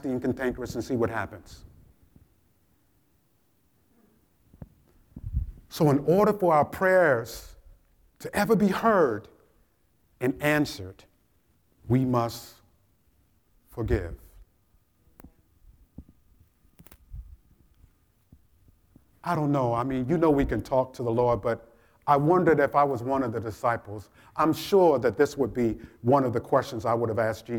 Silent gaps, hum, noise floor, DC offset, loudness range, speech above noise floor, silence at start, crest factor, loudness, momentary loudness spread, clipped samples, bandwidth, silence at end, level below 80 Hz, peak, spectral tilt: none; none; -68 dBFS; under 0.1%; 13 LU; 44 dB; 0.05 s; 20 dB; -25 LUFS; 18 LU; under 0.1%; 19.5 kHz; 0 s; -48 dBFS; -8 dBFS; -7 dB/octave